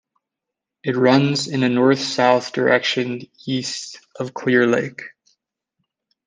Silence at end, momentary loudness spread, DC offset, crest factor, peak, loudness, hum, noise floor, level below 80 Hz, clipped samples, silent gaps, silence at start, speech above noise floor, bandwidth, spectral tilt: 1.15 s; 14 LU; under 0.1%; 18 dB; -2 dBFS; -18 LUFS; none; -84 dBFS; -68 dBFS; under 0.1%; none; 0.85 s; 65 dB; 9.6 kHz; -5 dB/octave